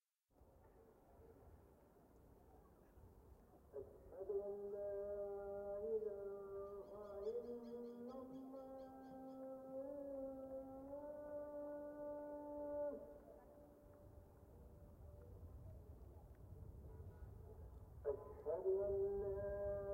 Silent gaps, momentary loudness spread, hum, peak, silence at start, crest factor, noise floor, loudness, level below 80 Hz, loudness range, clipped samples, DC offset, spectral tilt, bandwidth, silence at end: none; 22 LU; none; -32 dBFS; 0.35 s; 18 dB; -74 dBFS; -50 LUFS; -66 dBFS; 14 LU; under 0.1%; under 0.1%; -9 dB/octave; 16 kHz; 0 s